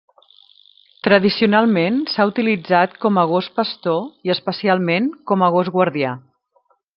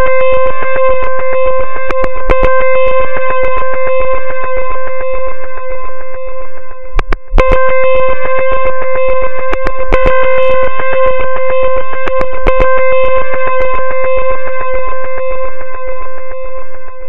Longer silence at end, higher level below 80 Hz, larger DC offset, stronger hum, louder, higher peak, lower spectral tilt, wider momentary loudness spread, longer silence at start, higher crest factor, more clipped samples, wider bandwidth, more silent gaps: first, 0.75 s vs 0 s; second, -62 dBFS vs -20 dBFS; second, under 0.1% vs 60%; neither; second, -18 LUFS vs -14 LUFS; about the same, 0 dBFS vs 0 dBFS; first, -9 dB/octave vs -7 dB/octave; second, 7 LU vs 13 LU; first, 1.05 s vs 0 s; about the same, 18 dB vs 16 dB; second, under 0.1% vs 0.3%; about the same, 5.8 kHz vs 6 kHz; neither